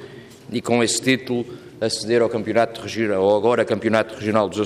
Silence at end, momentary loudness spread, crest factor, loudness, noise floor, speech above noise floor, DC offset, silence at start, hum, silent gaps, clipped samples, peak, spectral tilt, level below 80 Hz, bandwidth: 0 s; 9 LU; 16 dB; -20 LUFS; -40 dBFS; 20 dB; under 0.1%; 0 s; none; none; under 0.1%; -4 dBFS; -4.5 dB/octave; -62 dBFS; 14.5 kHz